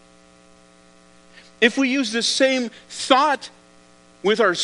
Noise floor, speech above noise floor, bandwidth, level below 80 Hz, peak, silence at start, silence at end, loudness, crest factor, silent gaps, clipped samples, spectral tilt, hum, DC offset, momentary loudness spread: -51 dBFS; 32 dB; 10.5 kHz; -66 dBFS; 0 dBFS; 1.6 s; 0 s; -20 LUFS; 22 dB; none; under 0.1%; -2.5 dB/octave; none; under 0.1%; 11 LU